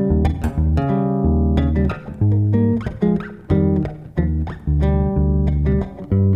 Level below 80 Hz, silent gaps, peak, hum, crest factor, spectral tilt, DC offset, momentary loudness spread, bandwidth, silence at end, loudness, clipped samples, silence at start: -24 dBFS; none; -4 dBFS; none; 14 dB; -10.5 dB/octave; under 0.1%; 5 LU; 5.2 kHz; 0 s; -19 LUFS; under 0.1%; 0 s